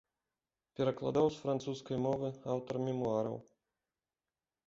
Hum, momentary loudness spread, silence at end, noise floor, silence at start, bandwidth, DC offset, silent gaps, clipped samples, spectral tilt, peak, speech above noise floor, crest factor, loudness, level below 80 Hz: none; 7 LU; 1.25 s; under -90 dBFS; 0.8 s; 7.6 kHz; under 0.1%; none; under 0.1%; -7 dB/octave; -18 dBFS; over 55 dB; 20 dB; -36 LUFS; -70 dBFS